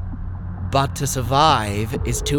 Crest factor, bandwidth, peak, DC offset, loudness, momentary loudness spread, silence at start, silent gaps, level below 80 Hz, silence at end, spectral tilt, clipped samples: 18 dB; 19 kHz; -2 dBFS; under 0.1%; -20 LUFS; 15 LU; 0 s; none; -32 dBFS; 0 s; -4.5 dB/octave; under 0.1%